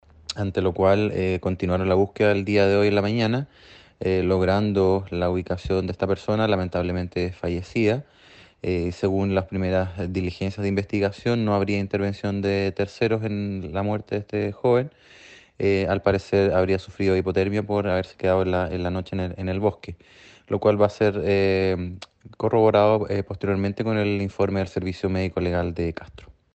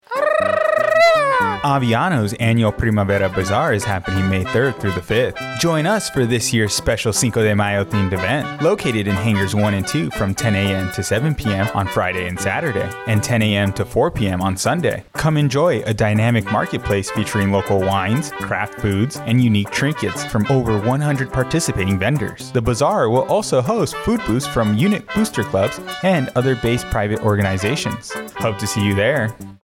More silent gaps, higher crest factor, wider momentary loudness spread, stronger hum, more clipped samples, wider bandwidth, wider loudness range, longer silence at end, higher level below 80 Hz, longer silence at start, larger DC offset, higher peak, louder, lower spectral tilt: neither; first, 18 dB vs 12 dB; first, 8 LU vs 5 LU; neither; neither; second, 8.4 kHz vs 17 kHz; about the same, 4 LU vs 2 LU; first, 0.25 s vs 0.1 s; second, -48 dBFS vs -40 dBFS; first, 0.3 s vs 0.1 s; neither; about the same, -4 dBFS vs -6 dBFS; second, -23 LUFS vs -18 LUFS; first, -7.5 dB/octave vs -5.5 dB/octave